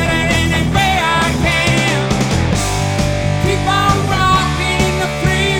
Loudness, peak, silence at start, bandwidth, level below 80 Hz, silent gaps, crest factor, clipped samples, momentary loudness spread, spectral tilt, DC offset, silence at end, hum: -14 LUFS; 0 dBFS; 0 s; 19.5 kHz; -26 dBFS; none; 14 dB; under 0.1%; 3 LU; -4.5 dB/octave; 0.8%; 0 s; none